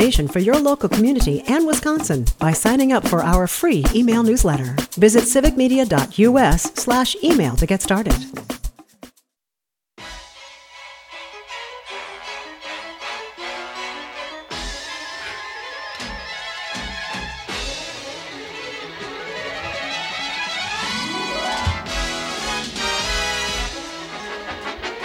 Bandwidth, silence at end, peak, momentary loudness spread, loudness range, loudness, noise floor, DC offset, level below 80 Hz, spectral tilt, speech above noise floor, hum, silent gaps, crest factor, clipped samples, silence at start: 19.5 kHz; 0 s; 0 dBFS; 16 LU; 16 LU; -20 LUFS; -86 dBFS; under 0.1%; -30 dBFS; -4.5 dB/octave; 70 dB; none; none; 20 dB; under 0.1%; 0 s